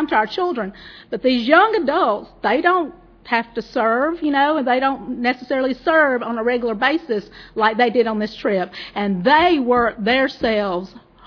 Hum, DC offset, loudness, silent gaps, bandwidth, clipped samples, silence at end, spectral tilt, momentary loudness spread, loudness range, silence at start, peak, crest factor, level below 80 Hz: none; under 0.1%; -18 LUFS; none; 5.4 kHz; under 0.1%; 0.3 s; -6.5 dB/octave; 11 LU; 2 LU; 0 s; 0 dBFS; 18 dB; -50 dBFS